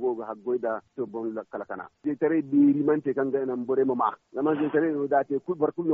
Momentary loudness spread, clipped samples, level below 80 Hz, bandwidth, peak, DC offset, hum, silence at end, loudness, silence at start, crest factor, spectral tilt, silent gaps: 12 LU; under 0.1%; -74 dBFS; 3.7 kHz; -10 dBFS; under 0.1%; none; 0 s; -27 LUFS; 0 s; 16 dB; -7.5 dB/octave; none